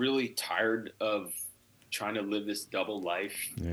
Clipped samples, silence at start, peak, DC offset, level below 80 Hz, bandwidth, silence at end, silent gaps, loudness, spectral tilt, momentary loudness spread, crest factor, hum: under 0.1%; 0 s; -14 dBFS; under 0.1%; -58 dBFS; over 20 kHz; 0 s; none; -33 LUFS; -3.5 dB/octave; 8 LU; 18 dB; none